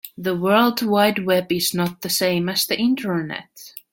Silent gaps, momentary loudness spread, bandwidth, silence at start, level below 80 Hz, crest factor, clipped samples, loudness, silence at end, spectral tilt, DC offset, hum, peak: none; 11 LU; 17 kHz; 0.05 s; -62 dBFS; 16 dB; under 0.1%; -20 LUFS; 0.15 s; -4 dB/octave; under 0.1%; none; -4 dBFS